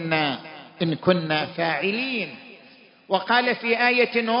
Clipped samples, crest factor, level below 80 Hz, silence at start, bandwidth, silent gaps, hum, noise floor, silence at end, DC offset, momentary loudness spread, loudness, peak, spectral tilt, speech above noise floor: under 0.1%; 20 dB; -70 dBFS; 0 s; 5.4 kHz; none; none; -51 dBFS; 0 s; under 0.1%; 11 LU; -22 LUFS; -4 dBFS; -9.5 dB/octave; 29 dB